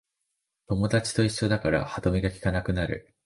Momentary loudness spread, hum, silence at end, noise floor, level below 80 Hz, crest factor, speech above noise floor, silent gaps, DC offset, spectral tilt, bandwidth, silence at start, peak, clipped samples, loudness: 5 LU; none; 0.25 s; -81 dBFS; -42 dBFS; 18 dB; 55 dB; none; under 0.1%; -6 dB/octave; 11.5 kHz; 0.7 s; -10 dBFS; under 0.1%; -27 LUFS